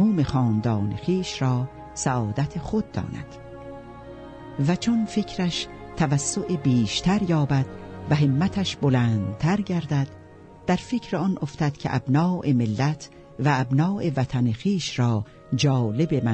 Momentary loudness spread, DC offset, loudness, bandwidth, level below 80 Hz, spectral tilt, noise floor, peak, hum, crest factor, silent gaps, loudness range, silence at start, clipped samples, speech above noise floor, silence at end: 13 LU; under 0.1%; -24 LUFS; 8.8 kHz; -48 dBFS; -6 dB/octave; -46 dBFS; -8 dBFS; none; 16 dB; none; 5 LU; 0 s; under 0.1%; 23 dB; 0 s